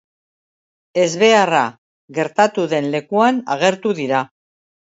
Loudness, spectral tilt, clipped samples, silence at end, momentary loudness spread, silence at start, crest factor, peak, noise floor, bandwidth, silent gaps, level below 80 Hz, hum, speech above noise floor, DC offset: -17 LUFS; -4.5 dB/octave; under 0.1%; 0.6 s; 11 LU; 0.95 s; 18 dB; 0 dBFS; under -90 dBFS; 8 kHz; 1.78-2.08 s; -70 dBFS; none; over 74 dB; under 0.1%